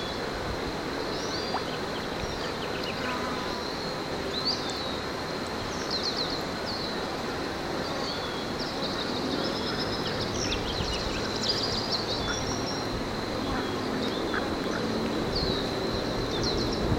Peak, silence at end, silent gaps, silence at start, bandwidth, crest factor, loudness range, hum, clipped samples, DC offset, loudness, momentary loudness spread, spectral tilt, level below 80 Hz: -12 dBFS; 0 s; none; 0 s; 16.5 kHz; 18 dB; 3 LU; none; under 0.1%; under 0.1%; -30 LUFS; 4 LU; -4 dB/octave; -44 dBFS